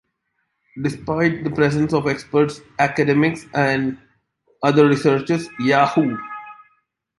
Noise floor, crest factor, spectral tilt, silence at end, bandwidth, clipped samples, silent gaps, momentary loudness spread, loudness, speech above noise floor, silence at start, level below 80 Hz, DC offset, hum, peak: -72 dBFS; 18 dB; -6.5 dB/octave; 0.65 s; 11.5 kHz; under 0.1%; none; 11 LU; -19 LUFS; 54 dB; 0.75 s; -54 dBFS; under 0.1%; none; -2 dBFS